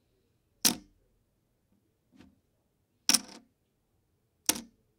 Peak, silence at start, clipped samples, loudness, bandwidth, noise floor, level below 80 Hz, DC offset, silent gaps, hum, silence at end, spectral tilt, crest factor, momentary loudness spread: -2 dBFS; 0.65 s; under 0.1%; -29 LUFS; 16.5 kHz; -75 dBFS; -72 dBFS; under 0.1%; none; none; 0.35 s; 0 dB/octave; 34 dB; 11 LU